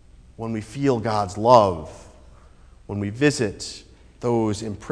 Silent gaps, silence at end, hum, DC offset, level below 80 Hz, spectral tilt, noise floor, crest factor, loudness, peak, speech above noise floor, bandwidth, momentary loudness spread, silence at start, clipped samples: none; 0 s; none; under 0.1%; -48 dBFS; -6 dB/octave; -48 dBFS; 22 dB; -22 LUFS; 0 dBFS; 27 dB; 11 kHz; 18 LU; 0.4 s; under 0.1%